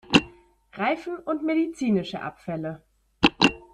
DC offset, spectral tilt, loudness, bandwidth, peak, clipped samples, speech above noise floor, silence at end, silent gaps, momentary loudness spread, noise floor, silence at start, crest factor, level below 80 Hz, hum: under 0.1%; -5 dB/octave; -25 LUFS; 11 kHz; -2 dBFS; under 0.1%; 25 dB; 0.15 s; none; 15 LU; -52 dBFS; 0.1 s; 24 dB; -52 dBFS; none